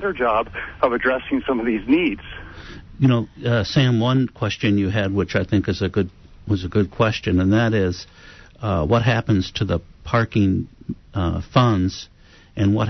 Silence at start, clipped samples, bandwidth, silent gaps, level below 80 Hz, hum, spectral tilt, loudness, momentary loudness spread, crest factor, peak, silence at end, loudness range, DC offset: 0 s; under 0.1%; 6.4 kHz; none; -42 dBFS; none; -7 dB/octave; -20 LUFS; 15 LU; 16 dB; -4 dBFS; 0 s; 2 LU; under 0.1%